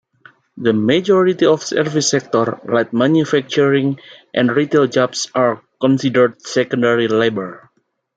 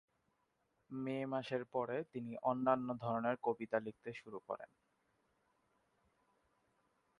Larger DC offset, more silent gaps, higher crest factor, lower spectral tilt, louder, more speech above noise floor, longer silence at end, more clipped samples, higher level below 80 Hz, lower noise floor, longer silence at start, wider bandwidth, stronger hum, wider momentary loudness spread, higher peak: neither; neither; second, 16 dB vs 24 dB; second, -5 dB/octave vs -8 dB/octave; first, -16 LUFS vs -41 LUFS; second, 33 dB vs 42 dB; second, 0.6 s vs 2.55 s; neither; first, -62 dBFS vs -82 dBFS; second, -49 dBFS vs -82 dBFS; second, 0.55 s vs 0.9 s; second, 9.2 kHz vs 10.5 kHz; neither; second, 6 LU vs 13 LU; first, 0 dBFS vs -20 dBFS